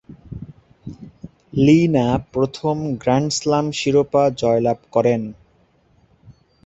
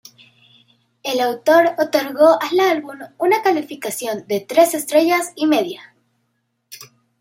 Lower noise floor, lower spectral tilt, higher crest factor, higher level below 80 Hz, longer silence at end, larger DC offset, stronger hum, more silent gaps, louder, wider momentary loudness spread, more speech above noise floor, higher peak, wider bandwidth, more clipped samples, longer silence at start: second, -58 dBFS vs -70 dBFS; first, -6 dB/octave vs -3 dB/octave; about the same, 18 dB vs 18 dB; first, -48 dBFS vs -72 dBFS; about the same, 0.35 s vs 0.35 s; neither; neither; neither; about the same, -18 LUFS vs -17 LUFS; first, 23 LU vs 15 LU; second, 40 dB vs 53 dB; about the same, -2 dBFS vs -2 dBFS; second, 8.2 kHz vs 16 kHz; neither; second, 0.1 s vs 1.05 s